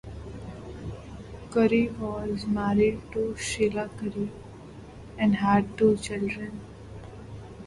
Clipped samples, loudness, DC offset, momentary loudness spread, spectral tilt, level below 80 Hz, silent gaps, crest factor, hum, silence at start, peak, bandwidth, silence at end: under 0.1%; -26 LUFS; under 0.1%; 21 LU; -6 dB/octave; -48 dBFS; none; 18 dB; none; 0.05 s; -10 dBFS; 11.5 kHz; 0 s